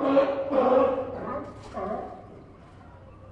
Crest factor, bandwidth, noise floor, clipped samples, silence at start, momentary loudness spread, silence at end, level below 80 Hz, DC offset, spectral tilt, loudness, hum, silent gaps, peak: 18 dB; 7.2 kHz; -48 dBFS; under 0.1%; 0 s; 19 LU; 0 s; -54 dBFS; under 0.1%; -7.5 dB/octave; -26 LUFS; none; none; -10 dBFS